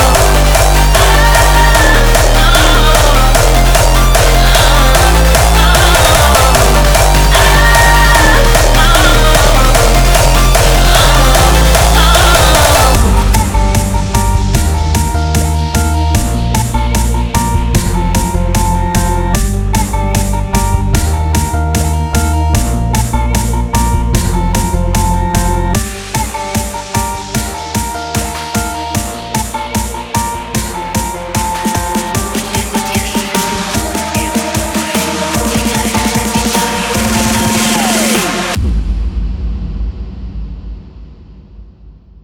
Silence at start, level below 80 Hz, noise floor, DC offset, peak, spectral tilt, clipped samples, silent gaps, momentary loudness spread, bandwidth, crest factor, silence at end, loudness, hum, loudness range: 0 s; -14 dBFS; -37 dBFS; under 0.1%; 0 dBFS; -4 dB/octave; under 0.1%; none; 10 LU; over 20 kHz; 10 dB; 0.3 s; -11 LUFS; none; 9 LU